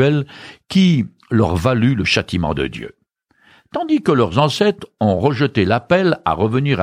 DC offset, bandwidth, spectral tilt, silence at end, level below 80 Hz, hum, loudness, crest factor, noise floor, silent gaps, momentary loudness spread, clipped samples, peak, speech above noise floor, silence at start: under 0.1%; 14.5 kHz; -6.5 dB/octave; 0 s; -42 dBFS; none; -17 LUFS; 16 dB; -58 dBFS; none; 10 LU; under 0.1%; -2 dBFS; 42 dB; 0 s